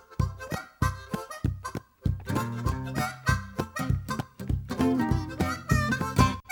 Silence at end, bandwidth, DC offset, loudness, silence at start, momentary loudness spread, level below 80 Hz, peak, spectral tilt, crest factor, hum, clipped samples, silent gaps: 0 s; 19.5 kHz; under 0.1%; -30 LUFS; 0.1 s; 10 LU; -38 dBFS; -8 dBFS; -6 dB/octave; 22 dB; none; under 0.1%; none